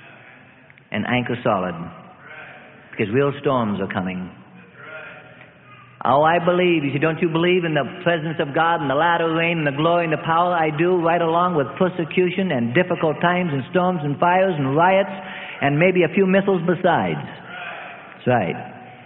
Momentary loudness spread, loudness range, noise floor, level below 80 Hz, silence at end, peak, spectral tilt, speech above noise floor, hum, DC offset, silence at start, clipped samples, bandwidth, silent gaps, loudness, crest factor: 17 LU; 7 LU; -48 dBFS; -58 dBFS; 0 s; -2 dBFS; -11.5 dB/octave; 29 dB; none; under 0.1%; 0 s; under 0.1%; 4.1 kHz; none; -19 LUFS; 18 dB